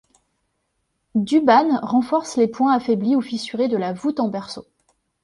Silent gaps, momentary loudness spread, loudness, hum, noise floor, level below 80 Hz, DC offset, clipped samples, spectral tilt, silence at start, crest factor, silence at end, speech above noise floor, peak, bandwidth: none; 11 LU; -20 LUFS; none; -72 dBFS; -64 dBFS; under 0.1%; under 0.1%; -6 dB/octave; 1.15 s; 18 dB; 0.6 s; 53 dB; -2 dBFS; 11.5 kHz